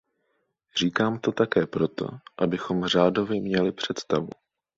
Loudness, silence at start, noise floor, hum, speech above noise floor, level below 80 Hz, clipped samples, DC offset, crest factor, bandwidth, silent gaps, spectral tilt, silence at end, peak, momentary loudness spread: -26 LUFS; 0.75 s; -74 dBFS; none; 49 dB; -60 dBFS; under 0.1%; under 0.1%; 20 dB; 7.8 kHz; none; -5.5 dB/octave; 0.45 s; -6 dBFS; 9 LU